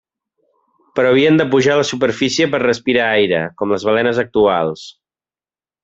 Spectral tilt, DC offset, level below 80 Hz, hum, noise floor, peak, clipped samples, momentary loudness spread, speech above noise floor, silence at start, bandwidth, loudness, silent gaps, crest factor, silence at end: -5 dB/octave; under 0.1%; -56 dBFS; none; under -90 dBFS; -2 dBFS; under 0.1%; 7 LU; over 75 dB; 0.95 s; 7.8 kHz; -15 LUFS; none; 14 dB; 0.95 s